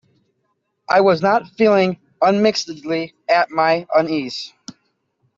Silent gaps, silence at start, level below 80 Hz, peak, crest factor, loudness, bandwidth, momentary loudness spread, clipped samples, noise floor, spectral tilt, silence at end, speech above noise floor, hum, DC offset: none; 0.9 s; -64 dBFS; -4 dBFS; 16 dB; -17 LUFS; 7.8 kHz; 9 LU; under 0.1%; -70 dBFS; -5 dB/octave; 0.9 s; 53 dB; none; under 0.1%